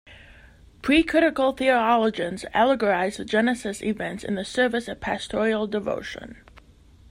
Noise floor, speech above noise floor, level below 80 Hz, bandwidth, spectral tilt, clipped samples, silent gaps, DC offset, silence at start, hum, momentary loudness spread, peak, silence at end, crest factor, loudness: -52 dBFS; 29 dB; -50 dBFS; 15.5 kHz; -4.5 dB/octave; under 0.1%; none; under 0.1%; 0.05 s; none; 10 LU; -6 dBFS; 0.5 s; 18 dB; -23 LUFS